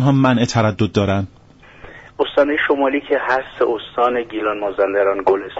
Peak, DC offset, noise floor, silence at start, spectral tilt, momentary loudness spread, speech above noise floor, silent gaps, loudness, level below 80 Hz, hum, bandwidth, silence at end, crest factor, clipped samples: -4 dBFS; under 0.1%; -42 dBFS; 0 s; -5 dB/octave; 6 LU; 25 dB; none; -18 LUFS; -50 dBFS; none; 8 kHz; 0 s; 14 dB; under 0.1%